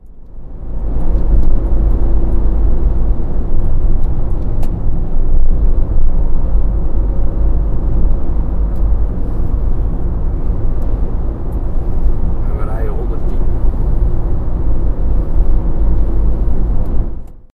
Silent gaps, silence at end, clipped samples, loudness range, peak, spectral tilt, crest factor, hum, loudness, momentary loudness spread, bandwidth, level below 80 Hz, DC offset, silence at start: none; 0.15 s; under 0.1%; 2 LU; 0 dBFS; -11 dB/octave; 10 dB; none; -19 LUFS; 4 LU; 1.8 kHz; -12 dBFS; under 0.1%; 0.05 s